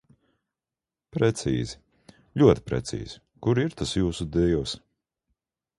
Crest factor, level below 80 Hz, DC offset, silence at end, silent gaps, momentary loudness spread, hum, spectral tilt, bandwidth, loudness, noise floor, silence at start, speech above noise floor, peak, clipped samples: 24 dB; -44 dBFS; under 0.1%; 1 s; none; 16 LU; none; -6.5 dB/octave; 11.5 kHz; -26 LUFS; under -90 dBFS; 1.15 s; over 66 dB; -4 dBFS; under 0.1%